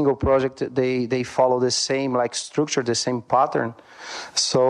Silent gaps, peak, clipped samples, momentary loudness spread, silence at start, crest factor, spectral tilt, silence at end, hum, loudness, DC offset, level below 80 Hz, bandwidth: none; -4 dBFS; under 0.1%; 7 LU; 0 s; 16 dB; -4 dB/octave; 0 s; none; -22 LUFS; under 0.1%; -48 dBFS; 11 kHz